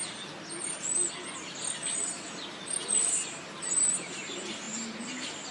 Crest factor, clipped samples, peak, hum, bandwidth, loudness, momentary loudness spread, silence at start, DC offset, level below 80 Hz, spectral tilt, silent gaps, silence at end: 18 dB; under 0.1%; -16 dBFS; none; 11.5 kHz; -30 LUFS; 13 LU; 0 s; under 0.1%; -78 dBFS; -0.5 dB/octave; none; 0 s